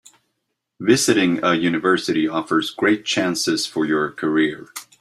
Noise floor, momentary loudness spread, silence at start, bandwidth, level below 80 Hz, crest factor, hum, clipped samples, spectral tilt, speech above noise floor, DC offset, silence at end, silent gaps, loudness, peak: -76 dBFS; 5 LU; 0.8 s; 15 kHz; -62 dBFS; 18 dB; none; under 0.1%; -4 dB/octave; 57 dB; under 0.1%; 0.2 s; none; -19 LUFS; -2 dBFS